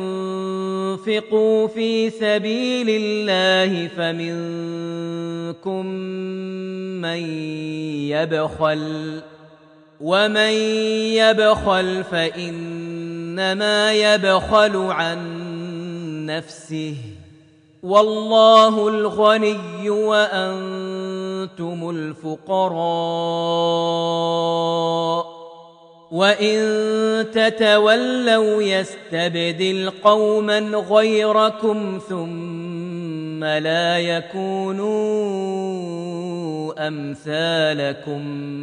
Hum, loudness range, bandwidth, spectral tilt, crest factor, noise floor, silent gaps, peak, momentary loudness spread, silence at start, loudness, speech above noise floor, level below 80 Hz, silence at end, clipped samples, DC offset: none; 7 LU; 10 kHz; -5 dB/octave; 20 dB; -50 dBFS; none; 0 dBFS; 13 LU; 0 s; -20 LUFS; 31 dB; -54 dBFS; 0 s; under 0.1%; under 0.1%